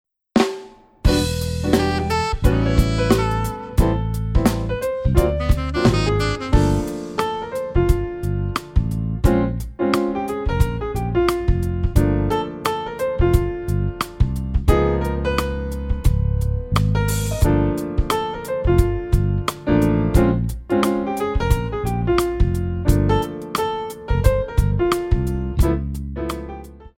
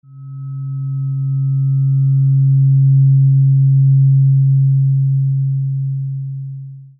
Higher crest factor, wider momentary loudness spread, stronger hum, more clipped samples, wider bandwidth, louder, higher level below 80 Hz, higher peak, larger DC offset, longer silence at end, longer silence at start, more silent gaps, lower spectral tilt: first, 18 dB vs 8 dB; second, 6 LU vs 15 LU; neither; neither; first, 17 kHz vs 1.4 kHz; second, -21 LUFS vs -14 LUFS; first, -24 dBFS vs -56 dBFS; first, 0 dBFS vs -6 dBFS; neither; about the same, 0.1 s vs 0.15 s; first, 0.35 s vs 0.1 s; neither; second, -6.5 dB/octave vs -15.5 dB/octave